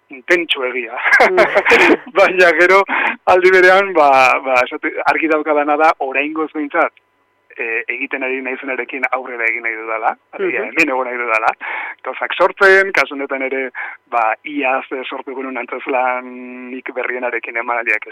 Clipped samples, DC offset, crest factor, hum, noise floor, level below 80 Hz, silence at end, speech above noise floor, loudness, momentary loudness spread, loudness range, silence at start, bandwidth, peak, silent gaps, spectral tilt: under 0.1%; under 0.1%; 14 dB; none; -50 dBFS; -58 dBFS; 0 s; 35 dB; -15 LUFS; 14 LU; 10 LU; 0.1 s; 15.5 kHz; -2 dBFS; none; -3.5 dB/octave